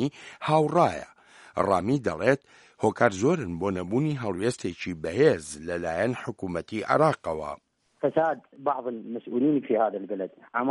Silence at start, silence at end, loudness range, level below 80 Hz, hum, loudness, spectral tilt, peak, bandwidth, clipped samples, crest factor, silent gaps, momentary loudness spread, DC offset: 0 s; 0 s; 2 LU; -60 dBFS; none; -27 LUFS; -6.5 dB/octave; -4 dBFS; 11.5 kHz; under 0.1%; 22 dB; none; 11 LU; under 0.1%